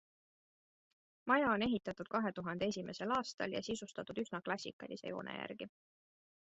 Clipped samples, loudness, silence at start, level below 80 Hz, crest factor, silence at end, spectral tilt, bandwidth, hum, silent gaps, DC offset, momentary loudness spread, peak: under 0.1%; -39 LUFS; 1.25 s; -72 dBFS; 24 dB; 0.8 s; -3.5 dB/octave; 8 kHz; none; 3.34-3.38 s, 4.73-4.79 s; under 0.1%; 13 LU; -16 dBFS